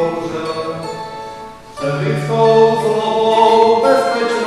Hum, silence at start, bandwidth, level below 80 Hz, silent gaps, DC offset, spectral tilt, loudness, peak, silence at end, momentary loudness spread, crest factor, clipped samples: none; 0 s; 12.5 kHz; -52 dBFS; none; under 0.1%; -5.5 dB/octave; -14 LUFS; 0 dBFS; 0 s; 17 LU; 14 dB; under 0.1%